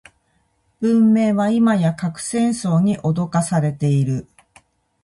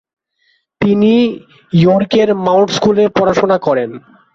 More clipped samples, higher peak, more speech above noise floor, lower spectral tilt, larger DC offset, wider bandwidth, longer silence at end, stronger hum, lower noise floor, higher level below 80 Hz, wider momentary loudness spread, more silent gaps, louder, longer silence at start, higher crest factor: neither; second, -6 dBFS vs 0 dBFS; about the same, 47 dB vs 48 dB; about the same, -7 dB/octave vs -6.5 dB/octave; neither; first, 11.5 kHz vs 7.6 kHz; first, 0.8 s vs 0.35 s; neither; first, -64 dBFS vs -60 dBFS; second, -56 dBFS vs -48 dBFS; about the same, 8 LU vs 7 LU; neither; second, -18 LUFS vs -12 LUFS; about the same, 0.8 s vs 0.8 s; about the same, 14 dB vs 12 dB